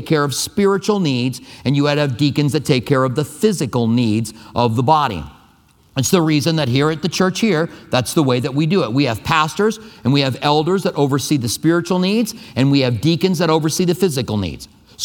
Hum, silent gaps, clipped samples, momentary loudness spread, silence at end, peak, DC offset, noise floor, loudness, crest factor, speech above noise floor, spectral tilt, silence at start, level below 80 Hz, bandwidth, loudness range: none; none; under 0.1%; 6 LU; 0 s; 0 dBFS; under 0.1%; -52 dBFS; -17 LUFS; 16 dB; 35 dB; -5.5 dB/octave; 0 s; -48 dBFS; 19 kHz; 1 LU